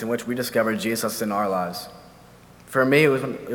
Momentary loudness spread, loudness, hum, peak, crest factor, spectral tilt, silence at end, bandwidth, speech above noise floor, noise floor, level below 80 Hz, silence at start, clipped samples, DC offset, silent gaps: 11 LU; -22 LUFS; none; -4 dBFS; 20 dB; -5 dB/octave; 0 s; 19.5 kHz; 26 dB; -48 dBFS; -60 dBFS; 0 s; under 0.1%; under 0.1%; none